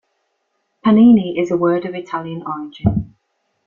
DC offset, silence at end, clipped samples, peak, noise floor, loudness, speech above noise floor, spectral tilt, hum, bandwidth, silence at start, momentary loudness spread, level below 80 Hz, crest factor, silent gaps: under 0.1%; 0.6 s; under 0.1%; -2 dBFS; -69 dBFS; -16 LUFS; 54 dB; -9 dB/octave; none; 7 kHz; 0.85 s; 16 LU; -42 dBFS; 16 dB; none